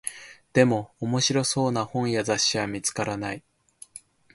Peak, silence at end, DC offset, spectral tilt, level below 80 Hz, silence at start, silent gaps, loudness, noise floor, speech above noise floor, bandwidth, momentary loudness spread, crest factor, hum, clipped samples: -4 dBFS; 0.35 s; under 0.1%; -4 dB/octave; -60 dBFS; 0.05 s; none; -25 LUFS; -51 dBFS; 27 dB; 12 kHz; 22 LU; 22 dB; none; under 0.1%